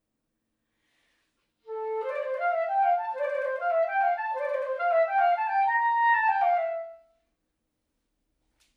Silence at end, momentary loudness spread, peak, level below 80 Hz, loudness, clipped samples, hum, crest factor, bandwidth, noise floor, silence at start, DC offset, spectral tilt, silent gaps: 1.8 s; 10 LU; -14 dBFS; -84 dBFS; -26 LUFS; under 0.1%; none; 14 dB; 5.6 kHz; -80 dBFS; 1.65 s; under 0.1%; -1 dB/octave; none